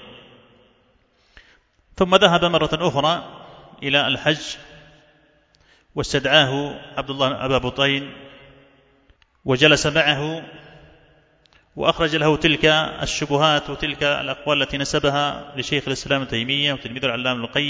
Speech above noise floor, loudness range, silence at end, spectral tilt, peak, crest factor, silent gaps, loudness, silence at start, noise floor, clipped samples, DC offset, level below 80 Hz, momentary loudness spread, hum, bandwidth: 40 dB; 3 LU; 0 s; -4 dB/octave; 0 dBFS; 22 dB; none; -19 LUFS; 0 s; -60 dBFS; under 0.1%; under 0.1%; -46 dBFS; 13 LU; none; 8 kHz